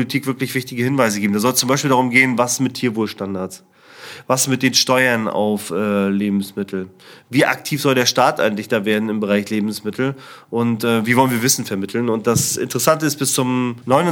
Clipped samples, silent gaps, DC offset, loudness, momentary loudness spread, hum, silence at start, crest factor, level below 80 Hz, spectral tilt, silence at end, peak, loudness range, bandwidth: under 0.1%; none; under 0.1%; -18 LUFS; 9 LU; none; 0 s; 18 dB; -62 dBFS; -4 dB/octave; 0 s; 0 dBFS; 2 LU; 19.5 kHz